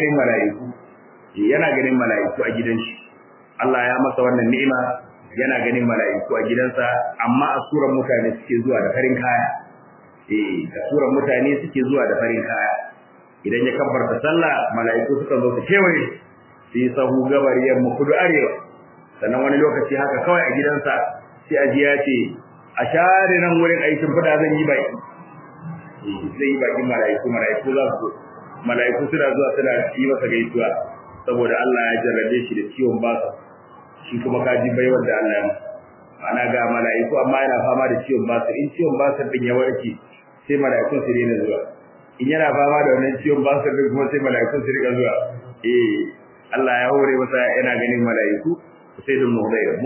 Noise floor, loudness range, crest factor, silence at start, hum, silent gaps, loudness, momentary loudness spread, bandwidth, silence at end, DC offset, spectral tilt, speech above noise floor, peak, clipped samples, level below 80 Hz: -48 dBFS; 3 LU; 18 dB; 0 s; none; none; -19 LUFS; 11 LU; 3.2 kHz; 0 s; under 0.1%; -10 dB/octave; 30 dB; -2 dBFS; under 0.1%; -64 dBFS